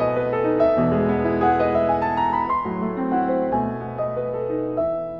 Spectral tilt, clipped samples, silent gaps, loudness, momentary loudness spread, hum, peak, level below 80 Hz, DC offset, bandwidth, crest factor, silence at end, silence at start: -9.5 dB/octave; under 0.1%; none; -22 LUFS; 7 LU; none; -8 dBFS; -46 dBFS; 0.2%; 5.8 kHz; 14 dB; 0 s; 0 s